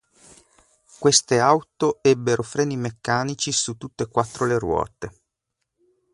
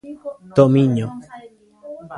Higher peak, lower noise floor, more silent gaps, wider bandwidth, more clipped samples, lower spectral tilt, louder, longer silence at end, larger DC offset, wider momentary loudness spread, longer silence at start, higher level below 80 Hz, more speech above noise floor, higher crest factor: about the same, -2 dBFS vs 0 dBFS; first, -80 dBFS vs -41 dBFS; neither; about the same, 11.5 kHz vs 10.5 kHz; neither; second, -3.5 dB/octave vs -9 dB/octave; second, -22 LUFS vs -16 LUFS; first, 1.05 s vs 0 s; neither; second, 11 LU vs 23 LU; first, 1 s vs 0.05 s; about the same, -52 dBFS vs -56 dBFS; first, 58 dB vs 23 dB; about the same, 20 dB vs 20 dB